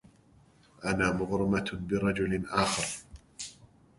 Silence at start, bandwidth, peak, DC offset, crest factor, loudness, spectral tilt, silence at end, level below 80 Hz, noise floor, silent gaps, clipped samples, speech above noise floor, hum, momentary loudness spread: 0.8 s; 11.5 kHz; -10 dBFS; under 0.1%; 22 dB; -30 LUFS; -4.5 dB/octave; 0.45 s; -52 dBFS; -61 dBFS; none; under 0.1%; 31 dB; none; 14 LU